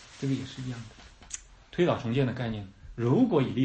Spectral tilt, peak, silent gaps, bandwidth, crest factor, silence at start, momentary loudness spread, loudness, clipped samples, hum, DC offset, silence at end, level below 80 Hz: -6.5 dB/octave; -12 dBFS; none; 8.8 kHz; 18 dB; 0 s; 17 LU; -29 LUFS; under 0.1%; none; under 0.1%; 0 s; -54 dBFS